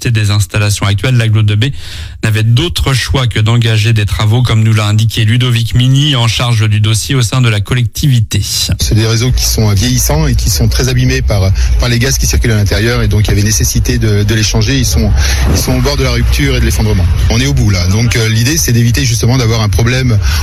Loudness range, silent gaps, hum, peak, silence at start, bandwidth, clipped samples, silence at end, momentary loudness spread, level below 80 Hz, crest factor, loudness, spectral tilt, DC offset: 1 LU; none; none; 0 dBFS; 0 s; 15.5 kHz; under 0.1%; 0 s; 2 LU; -18 dBFS; 8 dB; -10 LUFS; -4.5 dB/octave; under 0.1%